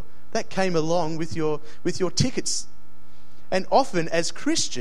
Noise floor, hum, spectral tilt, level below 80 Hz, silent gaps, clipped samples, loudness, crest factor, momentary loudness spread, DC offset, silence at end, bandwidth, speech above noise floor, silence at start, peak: -54 dBFS; none; -4 dB/octave; -52 dBFS; none; under 0.1%; -25 LUFS; 20 dB; 8 LU; 7%; 0 s; 15 kHz; 29 dB; 0.35 s; -4 dBFS